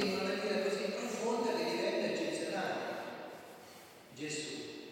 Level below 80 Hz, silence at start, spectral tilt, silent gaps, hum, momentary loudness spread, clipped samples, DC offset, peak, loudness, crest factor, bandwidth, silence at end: -82 dBFS; 0 s; -4 dB/octave; none; none; 17 LU; under 0.1%; under 0.1%; -22 dBFS; -37 LUFS; 16 dB; 17 kHz; 0 s